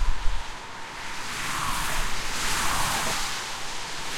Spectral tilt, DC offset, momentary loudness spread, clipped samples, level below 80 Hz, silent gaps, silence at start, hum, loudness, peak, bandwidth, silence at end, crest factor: -1.5 dB/octave; under 0.1%; 11 LU; under 0.1%; -32 dBFS; none; 0 s; none; -29 LUFS; -8 dBFS; 16.5 kHz; 0 s; 16 dB